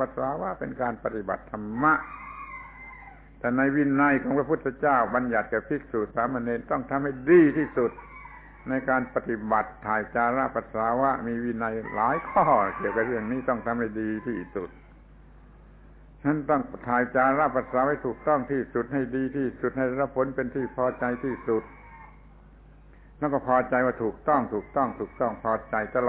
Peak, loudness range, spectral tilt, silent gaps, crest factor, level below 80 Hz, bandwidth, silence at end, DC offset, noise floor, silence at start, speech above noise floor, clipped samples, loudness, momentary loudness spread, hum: -8 dBFS; 5 LU; -11.5 dB/octave; none; 20 dB; -52 dBFS; 4 kHz; 0 s; under 0.1%; -51 dBFS; 0 s; 25 dB; under 0.1%; -26 LUFS; 10 LU; none